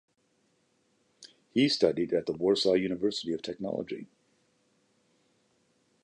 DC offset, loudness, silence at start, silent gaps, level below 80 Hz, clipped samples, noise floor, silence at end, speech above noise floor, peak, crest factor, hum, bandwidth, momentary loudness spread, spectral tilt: under 0.1%; -29 LUFS; 1.2 s; none; -68 dBFS; under 0.1%; -72 dBFS; 2 s; 44 dB; -10 dBFS; 22 dB; none; 11 kHz; 10 LU; -5 dB/octave